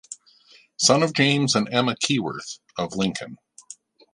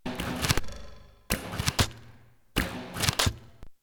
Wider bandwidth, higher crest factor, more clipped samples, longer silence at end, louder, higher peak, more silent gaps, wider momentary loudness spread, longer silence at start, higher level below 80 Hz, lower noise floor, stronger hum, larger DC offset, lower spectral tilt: second, 11.5 kHz vs over 20 kHz; about the same, 22 dB vs 26 dB; neither; first, 0.4 s vs 0.1 s; first, -21 LUFS vs -29 LUFS; about the same, -2 dBFS vs -4 dBFS; neither; first, 22 LU vs 10 LU; about the same, 0.1 s vs 0.05 s; second, -62 dBFS vs -42 dBFS; about the same, -55 dBFS vs -56 dBFS; neither; neither; about the same, -3.5 dB/octave vs -3 dB/octave